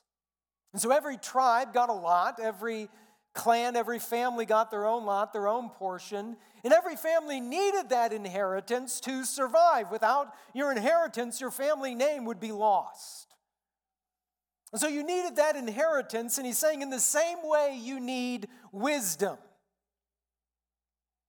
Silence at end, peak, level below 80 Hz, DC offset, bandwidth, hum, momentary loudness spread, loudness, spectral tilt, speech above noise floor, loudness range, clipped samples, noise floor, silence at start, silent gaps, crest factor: 1.9 s; -10 dBFS; under -90 dBFS; under 0.1%; 19 kHz; none; 12 LU; -29 LUFS; -2.5 dB/octave; over 61 dB; 5 LU; under 0.1%; under -90 dBFS; 0.75 s; none; 20 dB